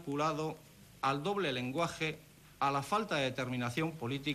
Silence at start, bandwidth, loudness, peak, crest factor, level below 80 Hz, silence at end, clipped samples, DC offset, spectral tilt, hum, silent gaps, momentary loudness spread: 0 s; 14.5 kHz; -35 LUFS; -18 dBFS; 16 dB; -66 dBFS; 0 s; under 0.1%; under 0.1%; -5 dB/octave; none; none; 5 LU